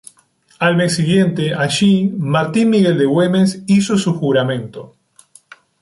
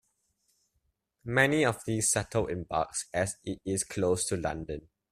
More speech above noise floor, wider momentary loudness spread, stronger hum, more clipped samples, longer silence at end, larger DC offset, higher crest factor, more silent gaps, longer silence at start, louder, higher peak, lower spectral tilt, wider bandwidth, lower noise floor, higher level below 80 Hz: second, 40 dB vs 48 dB; second, 5 LU vs 12 LU; neither; neither; first, 0.95 s vs 0.3 s; neither; second, 12 dB vs 24 dB; neither; second, 0.6 s vs 1.25 s; first, -15 LUFS vs -30 LUFS; first, -4 dBFS vs -8 dBFS; first, -6 dB/octave vs -4 dB/octave; second, 11.5 kHz vs 15.5 kHz; second, -54 dBFS vs -78 dBFS; about the same, -56 dBFS vs -56 dBFS